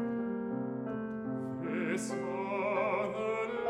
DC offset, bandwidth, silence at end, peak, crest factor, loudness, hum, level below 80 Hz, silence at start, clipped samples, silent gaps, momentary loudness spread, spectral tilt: under 0.1%; 12.5 kHz; 0 s; -20 dBFS; 14 dB; -35 LUFS; none; -70 dBFS; 0 s; under 0.1%; none; 6 LU; -6 dB/octave